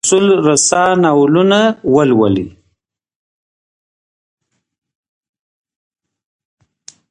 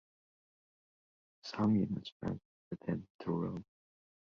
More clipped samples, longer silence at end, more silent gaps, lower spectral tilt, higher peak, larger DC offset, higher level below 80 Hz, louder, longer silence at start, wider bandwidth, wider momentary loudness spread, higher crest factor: neither; first, 4.6 s vs 0.7 s; second, none vs 2.12-2.20 s, 2.45-2.71 s, 3.10-3.19 s; second, -4.5 dB/octave vs -7.5 dB/octave; first, 0 dBFS vs -22 dBFS; neither; first, -50 dBFS vs -66 dBFS; first, -11 LUFS vs -38 LUFS; second, 0.05 s vs 1.45 s; first, 11.5 kHz vs 6.8 kHz; second, 4 LU vs 16 LU; about the same, 16 dB vs 18 dB